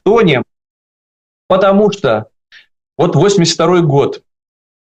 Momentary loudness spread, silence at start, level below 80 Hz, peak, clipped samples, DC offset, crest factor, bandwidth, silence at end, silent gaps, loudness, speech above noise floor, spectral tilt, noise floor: 9 LU; 0.05 s; -48 dBFS; -2 dBFS; under 0.1%; under 0.1%; 12 dB; 9 kHz; 0.6 s; 0.70-1.49 s; -12 LUFS; over 80 dB; -5.5 dB/octave; under -90 dBFS